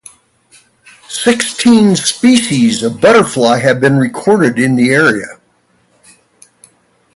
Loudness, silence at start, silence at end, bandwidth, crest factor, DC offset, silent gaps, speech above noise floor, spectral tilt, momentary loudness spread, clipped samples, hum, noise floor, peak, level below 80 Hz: -10 LUFS; 1.1 s; 1.85 s; 11.5 kHz; 12 dB; under 0.1%; none; 45 dB; -4.5 dB/octave; 5 LU; under 0.1%; none; -55 dBFS; 0 dBFS; -52 dBFS